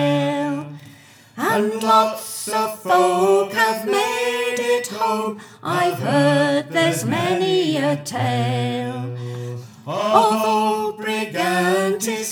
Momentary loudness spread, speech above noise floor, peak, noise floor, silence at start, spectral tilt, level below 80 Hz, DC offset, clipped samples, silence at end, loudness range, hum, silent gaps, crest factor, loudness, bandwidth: 12 LU; 27 dB; 0 dBFS; -46 dBFS; 0 s; -4.5 dB/octave; -76 dBFS; under 0.1%; under 0.1%; 0 s; 2 LU; none; none; 20 dB; -20 LUFS; over 20 kHz